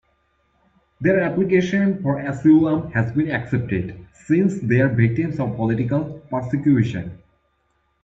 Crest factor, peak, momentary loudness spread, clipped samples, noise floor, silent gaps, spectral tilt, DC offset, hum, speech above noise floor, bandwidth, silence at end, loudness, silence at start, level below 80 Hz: 16 dB; -4 dBFS; 10 LU; under 0.1%; -67 dBFS; none; -8.5 dB/octave; under 0.1%; none; 48 dB; 7.8 kHz; 0.85 s; -20 LUFS; 1 s; -50 dBFS